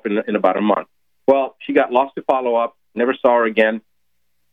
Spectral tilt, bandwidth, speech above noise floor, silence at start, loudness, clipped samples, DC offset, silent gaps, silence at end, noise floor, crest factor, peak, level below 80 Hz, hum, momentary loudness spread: -7.5 dB/octave; 4.2 kHz; 57 dB; 0.05 s; -18 LUFS; under 0.1%; under 0.1%; none; 0.75 s; -74 dBFS; 16 dB; -2 dBFS; -66 dBFS; none; 6 LU